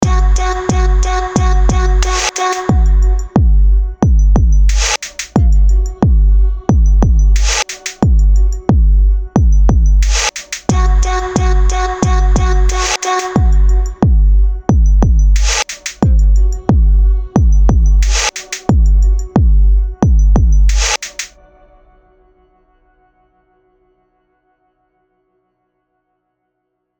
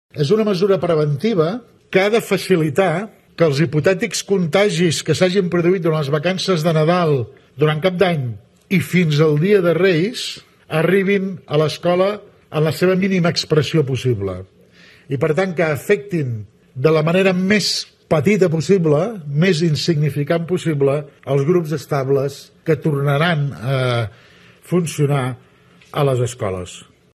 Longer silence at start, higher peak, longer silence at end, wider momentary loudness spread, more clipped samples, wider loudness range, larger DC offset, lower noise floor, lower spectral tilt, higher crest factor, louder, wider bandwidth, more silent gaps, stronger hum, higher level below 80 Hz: second, 0 s vs 0.15 s; about the same, 0 dBFS vs -2 dBFS; first, 5.75 s vs 0.35 s; second, 4 LU vs 10 LU; neither; about the same, 2 LU vs 3 LU; neither; first, -70 dBFS vs -47 dBFS; about the same, -5 dB/octave vs -6 dB/octave; second, 10 dB vs 16 dB; first, -13 LUFS vs -18 LUFS; second, 8.8 kHz vs 13.5 kHz; neither; neither; first, -12 dBFS vs -58 dBFS